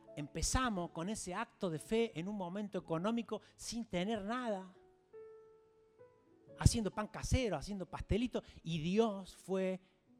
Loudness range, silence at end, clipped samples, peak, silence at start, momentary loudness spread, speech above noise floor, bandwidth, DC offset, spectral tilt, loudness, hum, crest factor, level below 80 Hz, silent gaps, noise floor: 5 LU; 0.4 s; under 0.1%; -14 dBFS; 0.05 s; 11 LU; 29 dB; 15.5 kHz; under 0.1%; -5 dB/octave; -39 LUFS; none; 26 dB; -50 dBFS; none; -67 dBFS